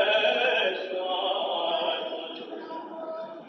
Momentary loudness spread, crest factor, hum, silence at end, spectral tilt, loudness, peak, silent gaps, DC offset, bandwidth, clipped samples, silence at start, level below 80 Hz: 15 LU; 16 dB; none; 0 s; -3 dB/octave; -27 LUFS; -12 dBFS; none; under 0.1%; 6.4 kHz; under 0.1%; 0 s; -88 dBFS